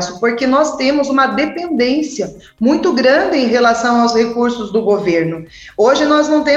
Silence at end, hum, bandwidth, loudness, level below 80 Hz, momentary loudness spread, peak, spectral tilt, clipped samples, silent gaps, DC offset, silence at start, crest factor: 0 s; none; 8.4 kHz; -14 LUFS; -50 dBFS; 6 LU; -2 dBFS; -4.5 dB/octave; under 0.1%; none; under 0.1%; 0 s; 12 dB